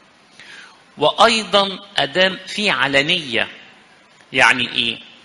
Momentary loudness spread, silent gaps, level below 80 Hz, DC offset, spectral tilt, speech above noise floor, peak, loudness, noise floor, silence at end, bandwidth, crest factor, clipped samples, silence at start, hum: 8 LU; none; -56 dBFS; under 0.1%; -2.5 dB/octave; 32 dB; 0 dBFS; -16 LUFS; -49 dBFS; 0.2 s; 11.5 kHz; 20 dB; under 0.1%; 0.4 s; none